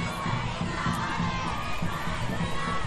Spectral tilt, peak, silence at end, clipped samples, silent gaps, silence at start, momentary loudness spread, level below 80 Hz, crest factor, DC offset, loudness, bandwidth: -5 dB/octave; -14 dBFS; 0 s; under 0.1%; none; 0 s; 3 LU; -40 dBFS; 14 dB; under 0.1%; -30 LUFS; 12.5 kHz